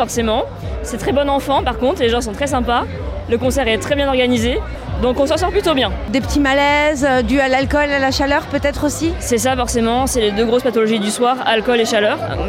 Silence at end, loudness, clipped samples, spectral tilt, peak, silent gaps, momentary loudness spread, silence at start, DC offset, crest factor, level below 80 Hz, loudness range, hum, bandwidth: 0 s; -16 LUFS; under 0.1%; -4.5 dB/octave; -2 dBFS; none; 6 LU; 0 s; under 0.1%; 14 dB; -30 dBFS; 2 LU; none; 16.5 kHz